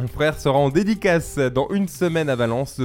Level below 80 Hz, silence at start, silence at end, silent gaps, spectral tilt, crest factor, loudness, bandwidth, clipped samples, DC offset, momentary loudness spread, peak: -42 dBFS; 0 s; 0 s; none; -6 dB/octave; 16 dB; -20 LUFS; 17 kHz; under 0.1%; under 0.1%; 4 LU; -4 dBFS